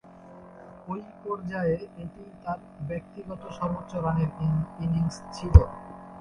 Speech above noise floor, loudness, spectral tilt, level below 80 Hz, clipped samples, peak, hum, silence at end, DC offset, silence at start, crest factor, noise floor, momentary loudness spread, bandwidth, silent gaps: 22 dB; -28 LUFS; -8.5 dB/octave; -32 dBFS; under 0.1%; 0 dBFS; none; 0 s; under 0.1%; 0.05 s; 26 dB; -48 dBFS; 24 LU; 9.8 kHz; none